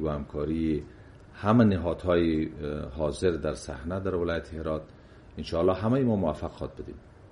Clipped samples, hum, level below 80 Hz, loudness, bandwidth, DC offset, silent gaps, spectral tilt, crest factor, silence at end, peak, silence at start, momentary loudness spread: under 0.1%; none; -44 dBFS; -28 LUFS; 11.5 kHz; under 0.1%; none; -7.5 dB/octave; 20 dB; 0.05 s; -8 dBFS; 0 s; 14 LU